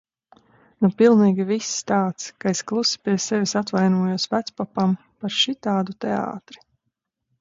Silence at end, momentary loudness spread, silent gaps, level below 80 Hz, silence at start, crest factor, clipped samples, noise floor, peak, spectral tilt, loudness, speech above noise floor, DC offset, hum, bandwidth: 0.85 s; 10 LU; none; -66 dBFS; 0.8 s; 18 dB; under 0.1%; -78 dBFS; -4 dBFS; -5 dB/octave; -22 LUFS; 57 dB; under 0.1%; none; 7.8 kHz